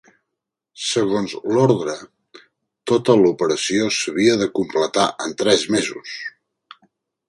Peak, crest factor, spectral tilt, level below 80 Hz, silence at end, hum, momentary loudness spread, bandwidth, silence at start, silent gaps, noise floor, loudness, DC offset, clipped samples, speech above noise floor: 0 dBFS; 20 dB; -4 dB/octave; -60 dBFS; 1 s; none; 14 LU; 11.5 kHz; 0.75 s; none; -82 dBFS; -19 LUFS; under 0.1%; under 0.1%; 63 dB